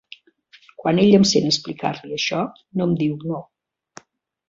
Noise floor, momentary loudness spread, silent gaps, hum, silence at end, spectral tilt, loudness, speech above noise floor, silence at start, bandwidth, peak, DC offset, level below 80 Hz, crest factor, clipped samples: -54 dBFS; 13 LU; none; none; 1.05 s; -5 dB/octave; -20 LUFS; 34 dB; 0.8 s; 7.8 kHz; -2 dBFS; under 0.1%; -60 dBFS; 20 dB; under 0.1%